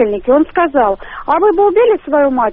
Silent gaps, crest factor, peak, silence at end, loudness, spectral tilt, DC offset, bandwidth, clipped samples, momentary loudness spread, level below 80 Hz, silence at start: none; 10 dB; -2 dBFS; 0 s; -12 LUFS; -3.5 dB/octave; under 0.1%; 3.9 kHz; under 0.1%; 5 LU; -40 dBFS; 0 s